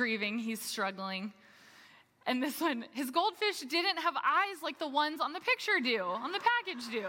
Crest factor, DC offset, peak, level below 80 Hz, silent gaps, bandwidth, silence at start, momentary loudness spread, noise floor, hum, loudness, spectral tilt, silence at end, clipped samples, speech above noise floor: 20 dB; under 0.1%; -14 dBFS; -88 dBFS; none; 17 kHz; 0 s; 8 LU; -60 dBFS; none; -32 LUFS; -2.5 dB/octave; 0 s; under 0.1%; 27 dB